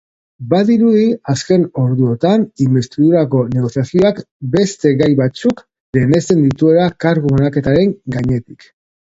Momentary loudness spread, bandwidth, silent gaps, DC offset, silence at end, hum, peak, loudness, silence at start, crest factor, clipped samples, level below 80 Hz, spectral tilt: 7 LU; 8 kHz; 4.31-4.40 s, 5.80-5.93 s; under 0.1%; 0.65 s; none; 0 dBFS; -14 LUFS; 0.4 s; 14 dB; under 0.1%; -44 dBFS; -7.5 dB/octave